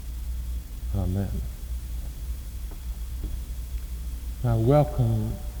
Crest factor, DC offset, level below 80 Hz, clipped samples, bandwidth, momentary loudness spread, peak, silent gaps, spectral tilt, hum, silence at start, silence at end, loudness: 20 dB; under 0.1%; -32 dBFS; under 0.1%; over 20 kHz; 15 LU; -8 dBFS; none; -8 dB/octave; none; 0 s; 0 s; -29 LUFS